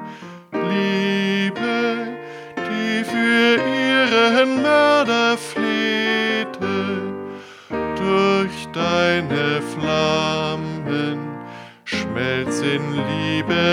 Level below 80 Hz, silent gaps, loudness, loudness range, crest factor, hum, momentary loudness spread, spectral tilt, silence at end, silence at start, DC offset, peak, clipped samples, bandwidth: -54 dBFS; none; -19 LUFS; 6 LU; 16 dB; none; 14 LU; -5 dB/octave; 0 s; 0 s; under 0.1%; -4 dBFS; under 0.1%; 15.5 kHz